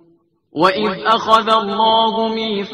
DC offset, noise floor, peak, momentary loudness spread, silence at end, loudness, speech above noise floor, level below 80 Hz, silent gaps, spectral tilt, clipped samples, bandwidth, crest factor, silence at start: under 0.1%; -56 dBFS; 0 dBFS; 6 LU; 0 s; -15 LUFS; 41 dB; -56 dBFS; none; -4.5 dB/octave; under 0.1%; 12.5 kHz; 16 dB; 0.55 s